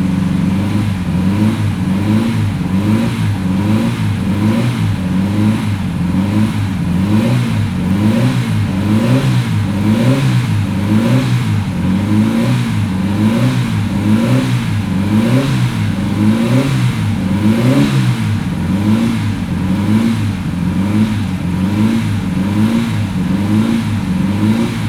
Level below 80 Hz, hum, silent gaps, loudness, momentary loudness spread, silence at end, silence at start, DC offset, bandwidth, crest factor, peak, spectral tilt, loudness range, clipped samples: -36 dBFS; none; none; -14 LUFS; 4 LU; 0 s; 0 s; under 0.1%; 15 kHz; 12 dB; 0 dBFS; -7 dB/octave; 2 LU; under 0.1%